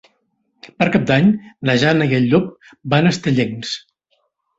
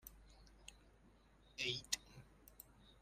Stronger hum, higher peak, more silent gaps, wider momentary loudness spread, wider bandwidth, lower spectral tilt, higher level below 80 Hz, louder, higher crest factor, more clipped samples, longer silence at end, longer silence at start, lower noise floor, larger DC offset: neither; first, -2 dBFS vs -22 dBFS; neither; second, 12 LU vs 22 LU; second, 8 kHz vs 15.5 kHz; first, -6.5 dB/octave vs -1.5 dB/octave; first, -52 dBFS vs -68 dBFS; first, -17 LUFS vs -44 LUFS; second, 16 dB vs 30 dB; neither; first, 0.8 s vs 0 s; first, 0.65 s vs 0.05 s; about the same, -67 dBFS vs -69 dBFS; neither